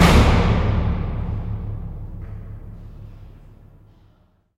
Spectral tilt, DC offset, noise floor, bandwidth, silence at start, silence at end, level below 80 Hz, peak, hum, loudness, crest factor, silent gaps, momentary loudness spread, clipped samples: -6 dB/octave; under 0.1%; -58 dBFS; 15.5 kHz; 0 s; 1.25 s; -26 dBFS; -2 dBFS; none; -21 LUFS; 18 dB; none; 24 LU; under 0.1%